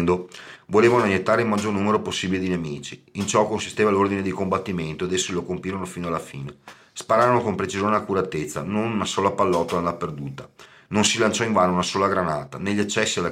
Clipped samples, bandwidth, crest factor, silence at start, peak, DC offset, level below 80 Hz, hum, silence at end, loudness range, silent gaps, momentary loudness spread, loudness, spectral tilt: under 0.1%; 15.5 kHz; 18 dB; 0 s; -6 dBFS; under 0.1%; -56 dBFS; none; 0 s; 3 LU; none; 12 LU; -22 LUFS; -4.5 dB/octave